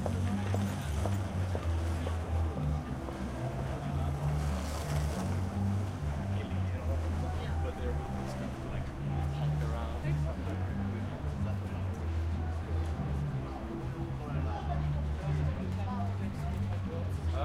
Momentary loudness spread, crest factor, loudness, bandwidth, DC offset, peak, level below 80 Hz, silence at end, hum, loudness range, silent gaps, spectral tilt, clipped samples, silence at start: 4 LU; 16 dB; -35 LUFS; 14.5 kHz; under 0.1%; -18 dBFS; -40 dBFS; 0 s; none; 1 LU; none; -7 dB/octave; under 0.1%; 0 s